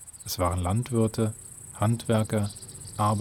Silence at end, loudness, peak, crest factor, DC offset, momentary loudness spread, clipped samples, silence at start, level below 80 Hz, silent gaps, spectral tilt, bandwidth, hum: 0 s; -28 LUFS; -10 dBFS; 16 dB; under 0.1%; 13 LU; under 0.1%; 0 s; -50 dBFS; none; -6 dB/octave; 18.5 kHz; none